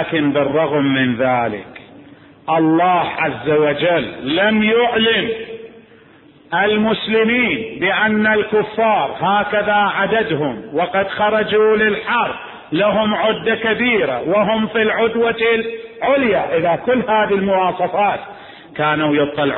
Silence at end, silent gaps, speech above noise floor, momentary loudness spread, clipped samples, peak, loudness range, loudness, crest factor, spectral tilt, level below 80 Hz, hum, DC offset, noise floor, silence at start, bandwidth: 0 s; none; 30 dB; 7 LU; under 0.1%; -4 dBFS; 2 LU; -16 LUFS; 14 dB; -10.5 dB/octave; -52 dBFS; none; under 0.1%; -46 dBFS; 0 s; 4.2 kHz